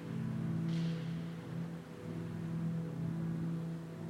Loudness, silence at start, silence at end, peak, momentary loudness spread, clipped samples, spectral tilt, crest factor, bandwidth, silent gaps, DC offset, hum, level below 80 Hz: -40 LUFS; 0 s; 0 s; -28 dBFS; 7 LU; under 0.1%; -8 dB/octave; 12 dB; 10 kHz; none; under 0.1%; none; -66 dBFS